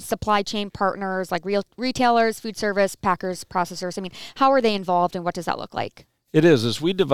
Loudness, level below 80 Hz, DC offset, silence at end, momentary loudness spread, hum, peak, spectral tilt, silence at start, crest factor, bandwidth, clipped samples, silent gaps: -22 LUFS; -54 dBFS; 0.6%; 0 s; 11 LU; none; -4 dBFS; -5 dB/octave; 0 s; 18 dB; 17.5 kHz; under 0.1%; none